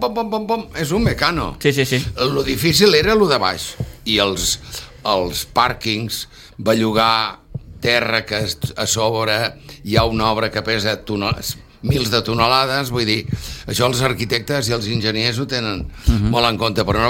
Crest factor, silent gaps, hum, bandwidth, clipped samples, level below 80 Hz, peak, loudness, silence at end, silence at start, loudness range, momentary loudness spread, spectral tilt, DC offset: 18 dB; none; none; 17 kHz; under 0.1%; -34 dBFS; 0 dBFS; -18 LUFS; 0 s; 0 s; 3 LU; 10 LU; -4 dB/octave; under 0.1%